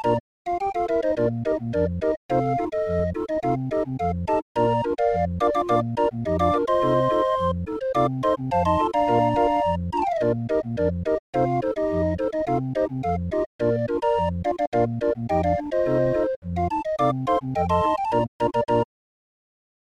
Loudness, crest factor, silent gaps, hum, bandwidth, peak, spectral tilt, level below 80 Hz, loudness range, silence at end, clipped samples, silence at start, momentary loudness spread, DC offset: -24 LUFS; 16 dB; 0.20-0.45 s, 2.17-2.29 s, 4.42-4.55 s, 11.19-11.33 s, 13.46-13.59 s, 14.67-14.72 s, 16.36-16.42 s, 18.28-18.39 s; none; 11 kHz; -8 dBFS; -8 dB/octave; -44 dBFS; 2 LU; 1 s; under 0.1%; 0 s; 5 LU; under 0.1%